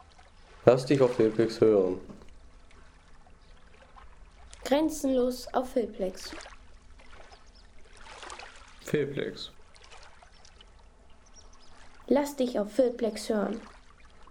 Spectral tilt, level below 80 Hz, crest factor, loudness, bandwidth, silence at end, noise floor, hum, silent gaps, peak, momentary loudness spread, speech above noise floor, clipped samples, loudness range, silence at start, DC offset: -6 dB/octave; -54 dBFS; 24 dB; -28 LUFS; 18 kHz; 0 s; -54 dBFS; none; none; -6 dBFS; 22 LU; 27 dB; under 0.1%; 11 LU; 0.65 s; under 0.1%